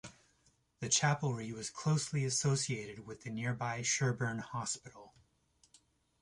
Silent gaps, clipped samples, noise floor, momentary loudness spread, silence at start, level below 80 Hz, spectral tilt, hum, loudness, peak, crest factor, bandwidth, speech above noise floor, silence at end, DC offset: none; under 0.1%; -73 dBFS; 14 LU; 0.05 s; -70 dBFS; -3.5 dB/octave; none; -35 LUFS; -16 dBFS; 20 dB; 11.5 kHz; 37 dB; 1.15 s; under 0.1%